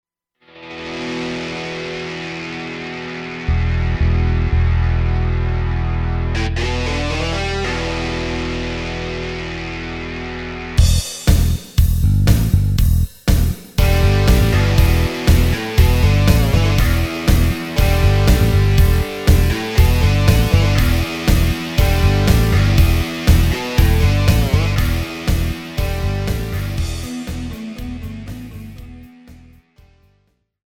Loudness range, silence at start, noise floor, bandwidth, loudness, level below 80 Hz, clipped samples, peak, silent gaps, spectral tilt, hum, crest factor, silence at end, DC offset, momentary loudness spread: 9 LU; 0.55 s; -62 dBFS; 18.5 kHz; -17 LUFS; -20 dBFS; under 0.1%; 0 dBFS; none; -6 dB/octave; none; 16 dB; 1.35 s; under 0.1%; 12 LU